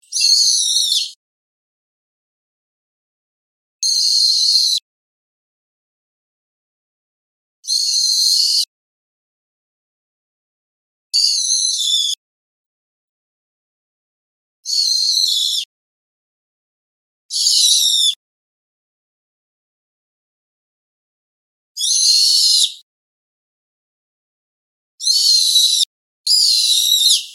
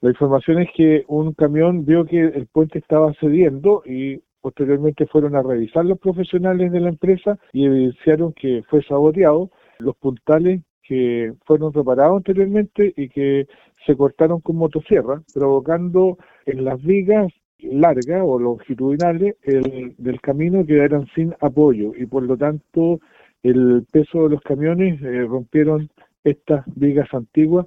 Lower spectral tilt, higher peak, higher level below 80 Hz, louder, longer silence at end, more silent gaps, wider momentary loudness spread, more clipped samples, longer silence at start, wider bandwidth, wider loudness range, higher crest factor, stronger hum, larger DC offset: second, 10.5 dB/octave vs -10 dB/octave; about the same, 0 dBFS vs 0 dBFS; second, under -90 dBFS vs -50 dBFS; first, -12 LUFS vs -18 LUFS; about the same, 0 s vs 0 s; first, 1.16-3.79 s, 4.82-7.63 s, 8.68-11.10 s, 12.17-14.63 s, 15.65-17.29 s, 18.16-21.75 s, 22.82-24.98 s, 25.86-26.24 s vs 10.70-10.81 s, 17.45-17.59 s, 26.19-26.23 s; first, 11 LU vs 8 LU; neither; about the same, 0.1 s vs 0 s; first, 16.5 kHz vs 7.8 kHz; first, 6 LU vs 2 LU; about the same, 20 dB vs 16 dB; neither; neither